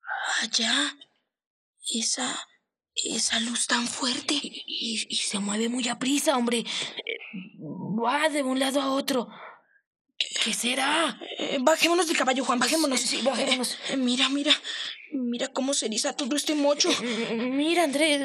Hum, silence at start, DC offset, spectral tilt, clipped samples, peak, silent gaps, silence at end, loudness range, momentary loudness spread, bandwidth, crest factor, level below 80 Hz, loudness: none; 0.05 s; under 0.1%; -1.5 dB/octave; under 0.1%; -6 dBFS; 1.46-1.73 s, 9.87-9.93 s, 10.01-10.05 s; 0 s; 4 LU; 10 LU; 15.5 kHz; 20 dB; -78 dBFS; -25 LUFS